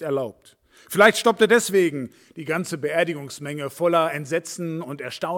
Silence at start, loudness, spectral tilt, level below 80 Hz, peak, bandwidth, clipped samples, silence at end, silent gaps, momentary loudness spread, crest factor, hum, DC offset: 0 s; -22 LUFS; -4 dB/octave; -70 dBFS; -2 dBFS; 18 kHz; under 0.1%; 0 s; none; 16 LU; 22 dB; none; under 0.1%